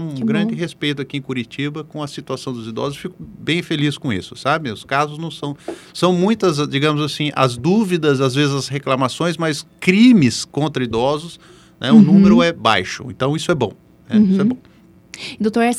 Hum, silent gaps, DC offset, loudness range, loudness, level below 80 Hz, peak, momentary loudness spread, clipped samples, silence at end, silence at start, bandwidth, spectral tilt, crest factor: none; none; under 0.1%; 9 LU; -17 LUFS; -52 dBFS; 0 dBFS; 15 LU; under 0.1%; 0 s; 0 s; 13 kHz; -6 dB/octave; 18 dB